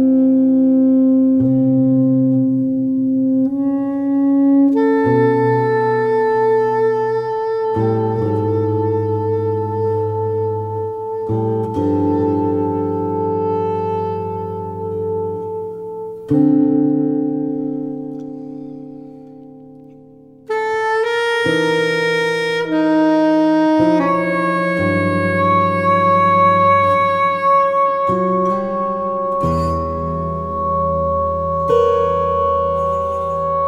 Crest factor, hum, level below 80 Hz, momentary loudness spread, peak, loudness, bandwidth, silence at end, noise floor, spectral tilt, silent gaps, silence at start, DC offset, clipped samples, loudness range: 14 dB; none; -42 dBFS; 10 LU; -2 dBFS; -16 LUFS; 10 kHz; 0 s; -43 dBFS; -8 dB/octave; none; 0 s; under 0.1%; under 0.1%; 7 LU